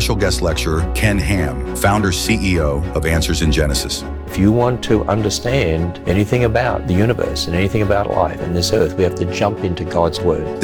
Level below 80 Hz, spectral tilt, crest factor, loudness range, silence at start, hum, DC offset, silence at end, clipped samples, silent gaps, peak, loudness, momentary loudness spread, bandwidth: -26 dBFS; -5.5 dB/octave; 14 dB; 1 LU; 0 s; none; under 0.1%; 0 s; under 0.1%; none; -2 dBFS; -17 LUFS; 4 LU; 19 kHz